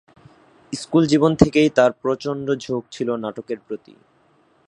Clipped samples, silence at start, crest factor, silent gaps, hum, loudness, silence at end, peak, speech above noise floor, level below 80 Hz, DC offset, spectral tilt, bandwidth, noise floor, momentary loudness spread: under 0.1%; 0.7 s; 20 dB; none; none; -20 LUFS; 0.9 s; 0 dBFS; 39 dB; -48 dBFS; under 0.1%; -6 dB/octave; 10.5 kHz; -59 dBFS; 16 LU